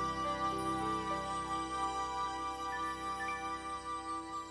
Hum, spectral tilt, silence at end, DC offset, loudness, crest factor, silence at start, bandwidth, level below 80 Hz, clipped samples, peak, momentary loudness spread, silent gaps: none; -4 dB/octave; 0 s; under 0.1%; -38 LUFS; 14 dB; 0 s; 11 kHz; -56 dBFS; under 0.1%; -24 dBFS; 5 LU; none